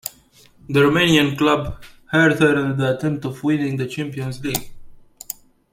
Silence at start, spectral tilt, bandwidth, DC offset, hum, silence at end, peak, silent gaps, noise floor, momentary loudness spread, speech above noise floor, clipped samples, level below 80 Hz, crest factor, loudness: 0.05 s; -5.5 dB/octave; 16.5 kHz; under 0.1%; none; 0.4 s; -2 dBFS; none; -51 dBFS; 18 LU; 33 dB; under 0.1%; -46 dBFS; 18 dB; -19 LUFS